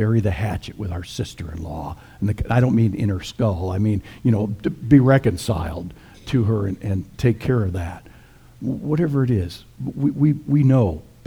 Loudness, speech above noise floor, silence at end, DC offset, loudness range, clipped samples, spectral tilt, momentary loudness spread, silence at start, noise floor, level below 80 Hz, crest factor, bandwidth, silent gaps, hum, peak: -21 LUFS; 27 dB; 0.25 s; under 0.1%; 4 LU; under 0.1%; -8 dB/octave; 14 LU; 0 s; -47 dBFS; -40 dBFS; 20 dB; 14.5 kHz; none; none; -2 dBFS